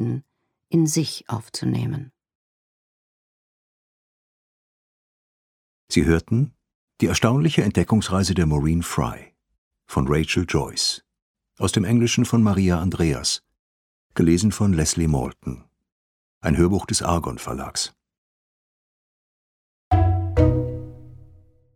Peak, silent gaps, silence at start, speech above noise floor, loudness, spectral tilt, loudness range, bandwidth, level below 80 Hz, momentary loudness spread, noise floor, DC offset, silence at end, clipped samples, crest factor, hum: -2 dBFS; 2.35-5.87 s, 6.75-6.88 s, 9.58-9.71 s, 11.22-11.34 s, 13.59-14.10 s, 15.92-16.41 s, 18.18-19.91 s; 0 s; 41 dB; -22 LUFS; -5.5 dB/octave; 7 LU; 17 kHz; -38 dBFS; 11 LU; -61 dBFS; under 0.1%; 0.5 s; under 0.1%; 22 dB; none